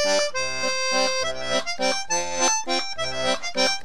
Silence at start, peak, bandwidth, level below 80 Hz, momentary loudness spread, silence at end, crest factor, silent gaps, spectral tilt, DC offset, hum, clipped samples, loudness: 0 s; -8 dBFS; 14.5 kHz; -54 dBFS; 4 LU; 0 s; 16 dB; none; -0.5 dB/octave; 3%; none; under 0.1%; -23 LUFS